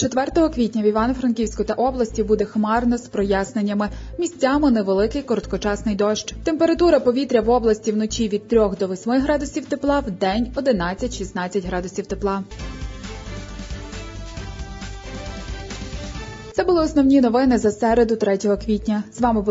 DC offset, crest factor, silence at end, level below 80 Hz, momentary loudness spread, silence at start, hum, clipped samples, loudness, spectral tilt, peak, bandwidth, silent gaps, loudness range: under 0.1%; 16 dB; 0 s; -36 dBFS; 16 LU; 0 s; none; under 0.1%; -20 LUFS; -5.5 dB/octave; -4 dBFS; 7.8 kHz; none; 11 LU